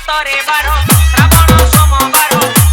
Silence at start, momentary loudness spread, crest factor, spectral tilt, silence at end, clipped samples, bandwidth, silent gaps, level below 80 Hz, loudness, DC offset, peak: 0 s; 5 LU; 8 dB; -4 dB/octave; 0 s; 1%; over 20 kHz; none; -14 dBFS; -8 LUFS; under 0.1%; 0 dBFS